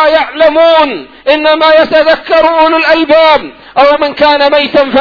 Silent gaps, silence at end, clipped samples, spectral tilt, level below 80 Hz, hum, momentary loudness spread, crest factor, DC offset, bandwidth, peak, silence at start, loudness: none; 0 s; 2%; -4.5 dB/octave; -40 dBFS; none; 5 LU; 6 dB; under 0.1%; 5.4 kHz; 0 dBFS; 0 s; -7 LUFS